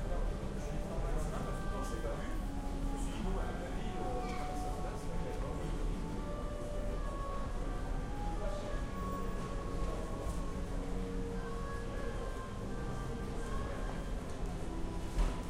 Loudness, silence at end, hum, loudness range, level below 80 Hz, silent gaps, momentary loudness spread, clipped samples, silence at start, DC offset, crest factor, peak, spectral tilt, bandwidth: -41 LUFS; 0 s; none; 1 LU; -40 dBFS; none; 3 LU; under 0.1%; 0 s; under 0.1%; 16 dB; -22 dBFS; -6 dB/octave; 13 kHz